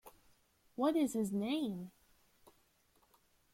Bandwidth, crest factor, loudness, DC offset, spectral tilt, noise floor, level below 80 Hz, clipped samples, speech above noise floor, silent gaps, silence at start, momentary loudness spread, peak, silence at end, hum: 16.5 kHz; 18 dB; -36 LUFS; under 0.1%; -5.5 dB/octave; -73 dBFS; -76 dBFS; under 0.1%; 38 dB; none; 0.05 s; 17 LU; -22 dBFS; 1.65 s; none